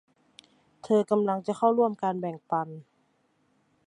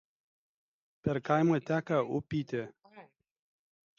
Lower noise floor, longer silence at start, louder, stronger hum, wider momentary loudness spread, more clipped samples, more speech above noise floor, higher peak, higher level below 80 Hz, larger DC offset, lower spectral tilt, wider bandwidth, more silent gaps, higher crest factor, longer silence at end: first, -70 dBFS vs -58 dBFS; second, 0.85 s vs 1.05 s; first, -27 LUFS vs -32 LUFS; neither; about the same, 10 LU vs 11 LU; neither; first, 43 dB vs 27 dB; about the same, -10 dBFS vs -12 dBFS; second, -78 dBFS vs -66 dBFS; neither; about the same, -7.5 dB/octave vs -8 dB/octave; first, 11 kHz vs 7.2 kHz; neither; about the same, 20 dB vs 22 dB; about the same, 1.05 s vs 0.95 s